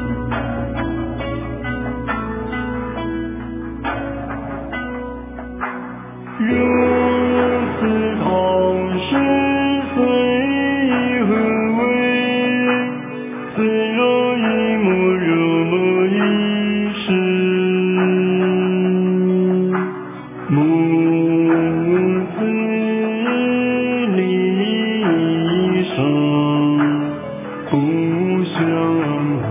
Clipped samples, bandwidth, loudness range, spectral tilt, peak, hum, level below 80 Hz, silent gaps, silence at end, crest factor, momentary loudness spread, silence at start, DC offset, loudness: under 0.1%; 3.8 kHz; 8 LU; -11 dB/octave; -2 dBFS; none; -40 dBFS; none; 0 s; 16 dB; 10 LU; 0 s; under 0.1%; -18 LUFS